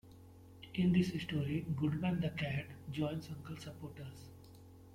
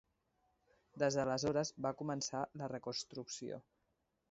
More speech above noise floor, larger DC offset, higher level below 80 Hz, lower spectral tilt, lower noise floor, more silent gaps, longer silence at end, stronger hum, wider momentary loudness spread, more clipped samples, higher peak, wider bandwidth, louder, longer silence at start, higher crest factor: second, 20 dB vs 43 dB; neither; first, -64 dBFS vs -74 dBFS; first, -7.5 dB/octave vs -4.5 dB/octave; second, -57 dBFS vs -83 dBFS; neither; second, 0 s vs 0.7 s; neither; first, 24 LU vs 10 LU; neither; about the same, -20 dBFS vs -22 dBFS; first, 15 kHz vs 7.6 kHz; about the same, -38 LUFS vs -40 LUFS; second, 0.05 s vs 0.95 s; about the same, 18 dB vs 20 dB